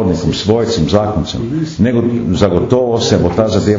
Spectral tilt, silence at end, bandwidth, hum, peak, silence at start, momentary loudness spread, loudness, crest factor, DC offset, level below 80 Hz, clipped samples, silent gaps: -6.5 dB/octave; 0 s; 7.6 kHz; none; 0 dBFS; 0 s; 6 LU; -13 LUFS; 12 dB; under 0.1%; -32 dBFS; 0.1%; none